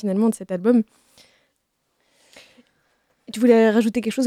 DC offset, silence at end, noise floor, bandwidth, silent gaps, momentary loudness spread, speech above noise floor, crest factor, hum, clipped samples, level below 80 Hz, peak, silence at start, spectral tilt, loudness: under 0.1%; 0 s; -72 dBFS; 14 kHz; none; 11 LU; 54 dB; 18 dB; none; under 0.1%; -66 dBFS; -4 dBFS; 0.05 s; -6 dB/octave; -19 LUFS